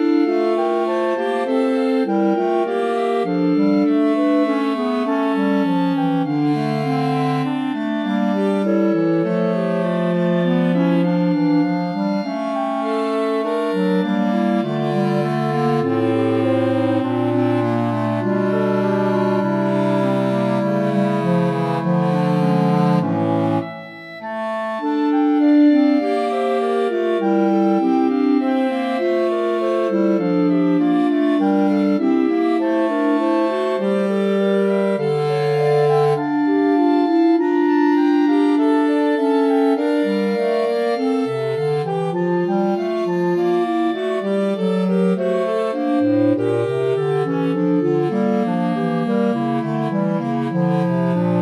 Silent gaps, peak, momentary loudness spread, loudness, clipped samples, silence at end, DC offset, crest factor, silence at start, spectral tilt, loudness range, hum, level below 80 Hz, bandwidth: none; -6 dBFS; 4 LU; -18 LUFS; under 0.1%; 0 s; under 0.1%; 12 dB; 0 s; -8.5 dB/octave; 3 LU; none; -72 dBFS; 11 kHz